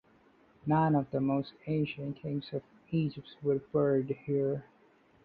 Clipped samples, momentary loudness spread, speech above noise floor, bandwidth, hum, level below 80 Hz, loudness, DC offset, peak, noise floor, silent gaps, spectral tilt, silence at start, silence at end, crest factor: under 0.1%; 10 LU; 33 dB; 4.9 kHz; none; -66 dBFS; -33 LUFS; under 0.1%; -16 dBFS; -64 dBFS; none; -11 dB/octave; 0.65 s; 0.65 s; 18 dB